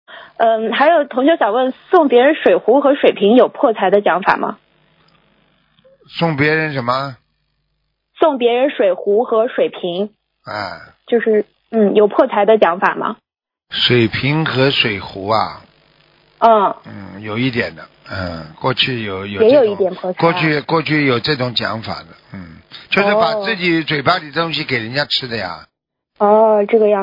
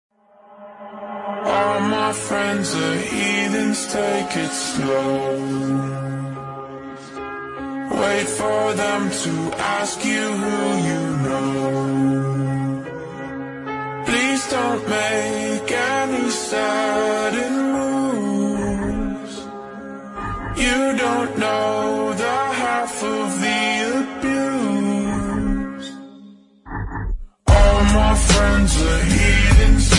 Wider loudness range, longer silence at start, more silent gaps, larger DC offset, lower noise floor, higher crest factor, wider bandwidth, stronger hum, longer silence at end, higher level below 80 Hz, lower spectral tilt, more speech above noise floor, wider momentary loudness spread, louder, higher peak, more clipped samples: about the same, 6 LU vs 5 LU; second, 0.1 s vs 0.5 s; neither; neither; first, -69 dBFS vs -48 dBFS; about the same, 16 dB vs 18 dB; second, 6 kHz vs 11.5 kHz; neither; about the same, 0 s vs 0 s; second, -56 dBFS vs -26 dBFS; first, -7.5 dB/octave vs -4.5 dB/octave; first, 54 dB vs 28 dB; about the same, 14 LU vs 15 LU; first, -15 LUFS vs -20 LUFS; about the same, 0 dBFS vs -2 dBFS; neither